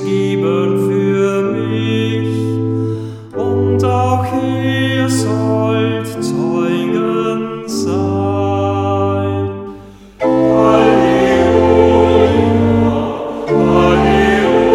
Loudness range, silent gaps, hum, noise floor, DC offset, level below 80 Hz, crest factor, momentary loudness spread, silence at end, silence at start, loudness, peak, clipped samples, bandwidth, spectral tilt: 5 LU; none; none; -35 dBFS; under 0.1%; -36 dBFS; 14 dB; 9 LU; 0 s; 0 s; -14 LUFS; 0 dBFS; under 0.1%; 16 kHz; -7 dB/octave